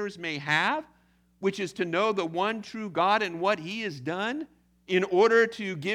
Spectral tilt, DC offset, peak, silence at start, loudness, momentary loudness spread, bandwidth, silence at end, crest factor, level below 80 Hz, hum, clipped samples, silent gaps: -5 dB/octave; under 0.1%; -10 dBFS; 0 s; -27 LUFS; 11 LU; 12 kHz; 0 s; 18 dB; -72 dBFS; 60 Hz at -60 dBFS; under 0.1%; none